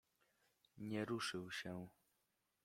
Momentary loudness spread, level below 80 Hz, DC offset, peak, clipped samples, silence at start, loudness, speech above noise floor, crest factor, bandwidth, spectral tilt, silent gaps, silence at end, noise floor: 11 LU; -82 dBFS; under 0.1%; -30 dBFS; under 0.1%; 0.75 s; -47 LUFS; 40 dB; 20 dB; 16.5 kHz; -4.5 dB/octave; none; 0.75 s; -86 dBFS